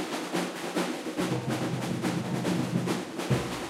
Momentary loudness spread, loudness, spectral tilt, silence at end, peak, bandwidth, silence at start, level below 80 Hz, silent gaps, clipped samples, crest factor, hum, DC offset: 3 LU; -31 LUFS; -5.5 dB/octave; 0 s; -14 dBFS; 16 kHz; 0 s; -58 dBFS; none; under 0.1%; 16 dB; none; under 0.1%